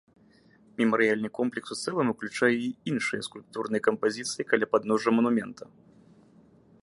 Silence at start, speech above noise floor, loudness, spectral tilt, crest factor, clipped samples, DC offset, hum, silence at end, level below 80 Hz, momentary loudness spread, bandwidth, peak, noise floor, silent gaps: 0.8 s; 32 dB; -27 LUFS; -4.5 dB/octave; 22 dB; under 0.1%; under 0.1%; none; 1.2 s; -74 dBFS; 11 LU; 11.5 kHz; -8 dBFS; -59 dBFS; none